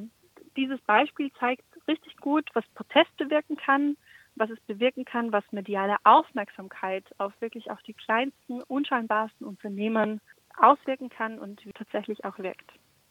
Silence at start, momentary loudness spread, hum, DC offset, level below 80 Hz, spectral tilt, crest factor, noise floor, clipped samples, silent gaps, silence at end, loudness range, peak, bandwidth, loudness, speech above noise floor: 0 s; 17 LU; none; under 0.1%; -80 dBFS; -6 dB/octave; 24 dB; -55 dBFS; under 0.1%; none; 0.6 s; 4 LU; -4 dBFS; 16 kHz; -27 LUFS; 28 dB